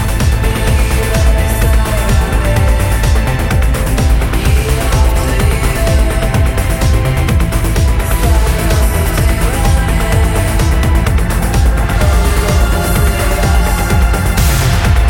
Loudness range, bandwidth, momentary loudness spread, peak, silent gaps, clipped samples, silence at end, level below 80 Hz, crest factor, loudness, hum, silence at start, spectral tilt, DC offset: 1 LU; 17 kHz; 1 LU; 0 dBFS; none; under 0.1%; 0 s; -12 dBFS; 10 dB; -13 LUFS; none; 0 s; -5 dB/octave; under 0.1%